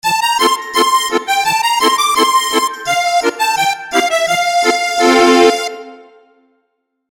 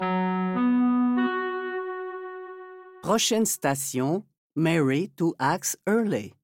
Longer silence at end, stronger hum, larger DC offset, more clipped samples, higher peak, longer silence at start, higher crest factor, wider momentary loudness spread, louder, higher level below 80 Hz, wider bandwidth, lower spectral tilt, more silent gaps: first, 1.1 s vs 0.15 s; neither; neither; neither; first, 0 dBFS vs -10 dBFS; about the same, 0.05 s vs 0 s; about the same, 14 dB vs 16 dB; second, 6 LU vs 13 LU; first, -12 LUFS vs -25 LUFS; first, -58 dBFS vs -70 dBFS; about the same, 17.5 kHz vs 17 kHz; second, -1.5 dB/octave vs -4.5 dB/octave; second, none vs 4.38-4.50 s